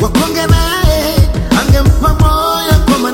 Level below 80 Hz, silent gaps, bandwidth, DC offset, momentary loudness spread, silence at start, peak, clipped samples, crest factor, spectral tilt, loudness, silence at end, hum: -14 dBFS; none; 17 kHz; under 0.1%; 3 LU; 0 s; 0 dBFS; 0.4%; 10 dB; -5.5 dB/octave; -11 LUFS; 0 s; none